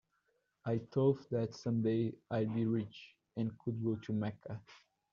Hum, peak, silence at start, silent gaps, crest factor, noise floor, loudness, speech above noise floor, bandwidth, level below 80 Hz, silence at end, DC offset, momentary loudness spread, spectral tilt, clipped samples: none; -20 dBFS; 0.65 s; none; 18 dB; -80 dBFS; -37 LUFS; 44 dB; 7.2 kHz; -74 dBFS; 0.35 s; under 0.1%; 15 LU; -8.5 dB/octave; under 0.1%